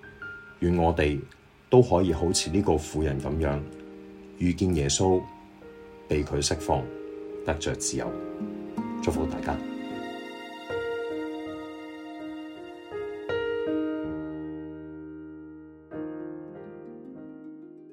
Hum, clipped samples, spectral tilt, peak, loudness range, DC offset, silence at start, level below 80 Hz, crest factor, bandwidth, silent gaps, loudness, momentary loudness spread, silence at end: none; under 0.1%; -5 dB/octave; -6 dBFS; 11 LU; under 0.1%; 0 s; -44 dBFS; 24 dB; 16 kHz; none; -28 LUFS; 20 LU; 0 s